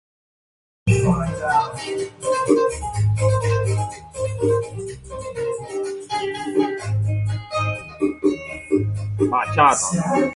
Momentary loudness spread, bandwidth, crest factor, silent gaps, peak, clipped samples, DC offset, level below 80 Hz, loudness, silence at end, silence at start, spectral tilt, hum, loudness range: 10 LU; 11.5 kHz; 18 dB; none; -4 dBFS; under 0.1%; under 0.1%; -42 dBFS; -22 LUFS; 0 s; 0.85 s; -6 dB/octave; none; 4 LU